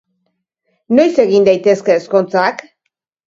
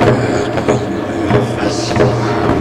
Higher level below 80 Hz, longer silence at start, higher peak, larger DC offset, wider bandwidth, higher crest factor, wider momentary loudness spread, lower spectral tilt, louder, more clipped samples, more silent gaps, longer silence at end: second, -60 dBFS vs -34 dBFS; first, 0.9 s vs 0 s; about the same, 0 dBFS vs 0 dBFS; neither; second, 7.6 kHz vs 12 kHz; about the same, 14 dB vs 12 dB; about the same, 5 LU vs 3 LU; about the same, -6 dB/octave vs -6 dB/octave; about the same, -13 LUFS vs -15 LUFS; neither; neither; first, 0.7 s vs 0 s